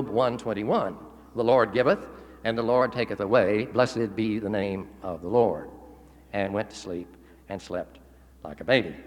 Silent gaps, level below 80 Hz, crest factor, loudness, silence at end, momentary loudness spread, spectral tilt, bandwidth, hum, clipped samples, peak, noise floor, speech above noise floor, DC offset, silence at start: none; -56 dBFS; 20 dB; -26 LUFS; 0 s; 17 LU; -6.5 dB/octave; 11.5 kHz; none; under 0.1%; -6 dBFS; -50 dBFS; 24 dB; under 0.1%; 0 s